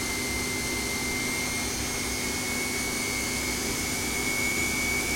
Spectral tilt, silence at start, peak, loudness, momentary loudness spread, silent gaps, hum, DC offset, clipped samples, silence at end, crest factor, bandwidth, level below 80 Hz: -2 dB/octave; 0 s; -16 dBFS; -27 LUFS; 3 LU; none; 50 Hz at -45 dBFS; under 0.1%; under 0.1%; 0 s; 14 dB; 16.5 kHz; -44 dBFS